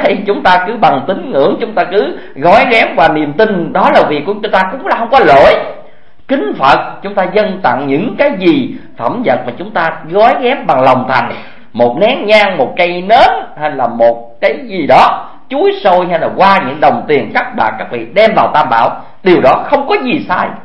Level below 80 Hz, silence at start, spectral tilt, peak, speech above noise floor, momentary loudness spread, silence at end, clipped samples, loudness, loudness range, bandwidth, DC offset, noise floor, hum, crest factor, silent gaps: -44 dBFS; 0 s; -6.5 dB/octave; 0 dBFS; 29 dB; 8 LU; 0.05 s; 0.8%; -10 LUFS; 3 LU; 11 kHz; 3%; -39 dBFS; none; 10 dB; none